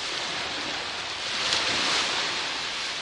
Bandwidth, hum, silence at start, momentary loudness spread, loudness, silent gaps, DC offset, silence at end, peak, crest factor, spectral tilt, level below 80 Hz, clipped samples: 11.5 kHz; none; 0 s; 7 LU; -26 LUFS; none; under 0.1%; 0 s; -6 dBFS; 24 dB; -0.5 dB/octave; -60 dBFS; under 0.1%